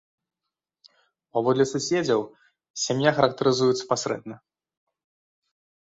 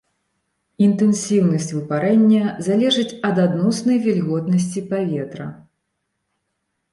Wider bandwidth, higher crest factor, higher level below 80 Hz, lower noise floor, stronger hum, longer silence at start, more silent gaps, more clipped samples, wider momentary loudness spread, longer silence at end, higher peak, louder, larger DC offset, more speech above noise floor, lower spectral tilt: second, 8 kHz vs 11.5 kHz; first, 24 dB vs 14 dB; about the same, -66 dBFS vs -64 dBFS; first, -86 dBFS vs -74 dBFS; neither; first, 1.35 s vs 0.8 s; first, 2.70-2.74 s vs none; neither; first, 12 LU vs 8 LU; first, 1.55 s vs 1.4 s; about the same, -4 dBFS vs -6 dBFS; second, -24 LUFS vs -18 LUFS; neither; first, 63 dB vs 57 dB; second, -4.5 dB/octave vs -6 dB/octave